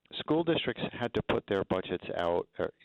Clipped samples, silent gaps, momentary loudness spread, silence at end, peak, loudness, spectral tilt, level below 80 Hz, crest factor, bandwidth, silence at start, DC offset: under 0.1%; none; 6 LU; 0.15 s; -16 dBFS; -32 LUFS; -7.5 dB/octave; -58 dBFS; 16 dB; 8.2 kHz; 0.1 s; under 0.1%